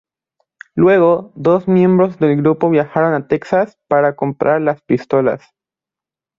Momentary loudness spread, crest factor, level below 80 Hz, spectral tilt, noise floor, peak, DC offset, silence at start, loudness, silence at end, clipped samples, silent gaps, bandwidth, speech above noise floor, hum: 6 LU; 14 dB; -56 dBFS; -9.5 dB/octave; -88 dBFS; -2 dBFS; under 0.1%; 0.75 s; -15 LUFS; 1 s; under 0.1%; none; 7.2 kHz; 74 dB; none